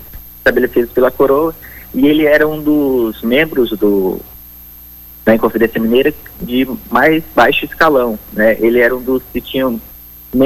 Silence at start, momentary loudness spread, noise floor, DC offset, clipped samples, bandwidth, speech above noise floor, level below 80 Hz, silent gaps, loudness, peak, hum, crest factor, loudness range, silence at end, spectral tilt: 0 s; 20 LU; -36 dBFS; under 0.1%; under 0.1%; 16.5 kHz; 23 dB; -38 dBFS; none; -13 LUFS; 0 dBFS; 60 Hz at -40 dBFS; 12 dB; 2 LU; 0 s; -6 dB/octave